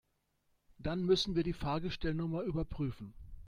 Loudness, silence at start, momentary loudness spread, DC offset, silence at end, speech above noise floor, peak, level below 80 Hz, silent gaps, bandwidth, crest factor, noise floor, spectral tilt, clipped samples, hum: -36 LUFS; 0.8 s; 11 LU; under 0.1%; 0 s; 43 dB; -18 dBFS; -50 dBFS; none; 11 kHz; 18 dB; -78 dBFS; -6.5 dB/octave; under 0.1%; none